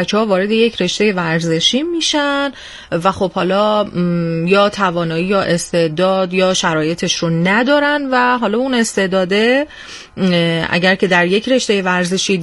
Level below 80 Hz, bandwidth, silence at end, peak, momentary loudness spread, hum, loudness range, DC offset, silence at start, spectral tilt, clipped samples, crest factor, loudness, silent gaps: -50 dBFS; 11.5 kHz; 0 s; 0 dBFS; 5 LU; none; 1 LU; under 0.1%; 0 s; -4.5 dB/octave; under 0.1%; 14 dB; -15 LUFS; none